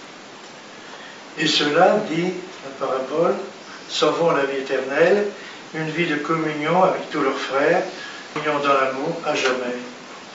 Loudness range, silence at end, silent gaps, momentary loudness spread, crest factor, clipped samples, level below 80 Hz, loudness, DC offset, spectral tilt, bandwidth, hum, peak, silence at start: 1 LU; 0 s; none; 20 LU; 20 dB; under 0.1%; -74 dBFS; -21 LUFS; under 0.1%; -4.5 dB/octave; 8 kHz; none; -2 dBFS; 0 s